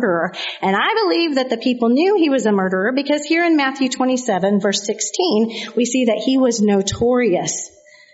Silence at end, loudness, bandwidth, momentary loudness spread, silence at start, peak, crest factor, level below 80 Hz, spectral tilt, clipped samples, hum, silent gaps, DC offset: 0.45 s; -17 LUFS; 8 kHz; 5 LU; 0 s; -4 dBFS; 14 dB; -54 dBFS; -4 dB/octave; under 0.1%; none; none; under 0.1%